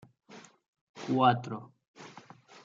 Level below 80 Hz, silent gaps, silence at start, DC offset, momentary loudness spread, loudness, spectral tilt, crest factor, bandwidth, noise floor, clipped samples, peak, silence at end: -78 dBFS; 0.68-0.73 s, 0.81-0.94 s, 1.88-1.94 s; 0.3 s; under 0.1%; 27 LU; -28 LUFS; -6.5 dB/octave; 24 dB; 7.6 kHz; -54 dBFS; under 0.1%; -10 dBFS; 0.55 s